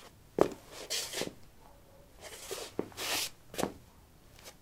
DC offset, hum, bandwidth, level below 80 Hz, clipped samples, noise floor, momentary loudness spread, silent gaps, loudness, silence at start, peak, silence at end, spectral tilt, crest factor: under 0.1%; none; 16 kHz; -62 dBFS; under 0.1%; -58 dBFS; 20 LU; none; -36 LUFS; 0 s; -8 dBFS; 0.05 s; -2.5 dB/octave; 32 dB